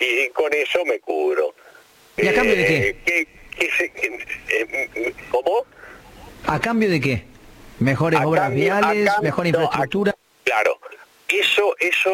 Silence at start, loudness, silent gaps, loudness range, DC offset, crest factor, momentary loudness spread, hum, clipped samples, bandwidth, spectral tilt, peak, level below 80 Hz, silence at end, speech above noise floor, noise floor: 0 s; -20 LUFS; none; 4 LU; under 0.1%; 16 dB; 8 LU; none; under 0.1%; 17 kHz; -5 dB/octave; -4 dBFS; -48 dBFS; 0 s; 30 dB; -49 dBFS